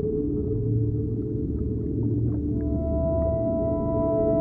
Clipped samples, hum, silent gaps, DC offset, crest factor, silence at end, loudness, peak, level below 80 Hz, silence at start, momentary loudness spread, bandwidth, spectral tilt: under 0.1%; none; none; under 0.1%; 12 dB; 0 s; -26 LUFS; -12 dBFS; -34 dBFS; 0 s; 4 LU; 2.1 kHz; -14.5 dB/octave